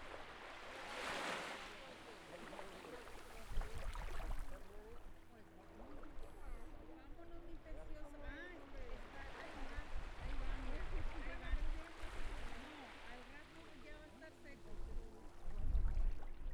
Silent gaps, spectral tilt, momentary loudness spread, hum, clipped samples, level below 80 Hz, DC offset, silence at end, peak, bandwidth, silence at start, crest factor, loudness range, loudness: none; -4.5 dB/octave; 14 LU; none; under 0.1%; -46 dBFS; under 0.1%; 0 s; -26 dBFS; 12 kHz; 0 s; 18 dB; 7 LU; -51 LUFS